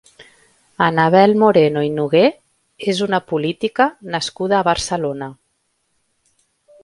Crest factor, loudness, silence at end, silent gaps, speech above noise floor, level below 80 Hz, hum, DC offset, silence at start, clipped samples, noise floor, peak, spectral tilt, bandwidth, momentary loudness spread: 18 dB; -17 LUFS; 1.5 s; none; 52 dB; -52 dBFS; none; under 0.1%; 0.2 s; under 0.1%; -68 dBFS; 0 dBFS; -5.5 dB/octave; 11.5 kHz; 11 LU